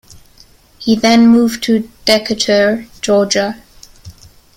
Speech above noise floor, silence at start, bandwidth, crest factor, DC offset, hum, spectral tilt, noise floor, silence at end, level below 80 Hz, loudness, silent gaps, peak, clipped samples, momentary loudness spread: 33 dB; 0.8 s; 16 kHz; 14 dB; under 0.1%; none; -4 dB/octave; -45 dBFS; 0.45 s; -46 dBFS; -13 LUFS; none; 0 dBFS; under 0.1%; 12 LU